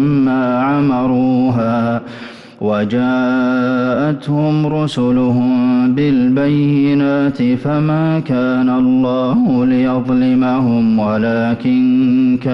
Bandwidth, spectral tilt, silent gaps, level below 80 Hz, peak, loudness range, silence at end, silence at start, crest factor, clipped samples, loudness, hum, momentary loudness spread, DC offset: 6 kHz; -9 dB/octave; none; -48 dBFS; -6 dBFS; 2 LU; 0 s; 0 s; 8 dB; under 0.1%; -14 LUFS; none; 4 LU; under 0.1%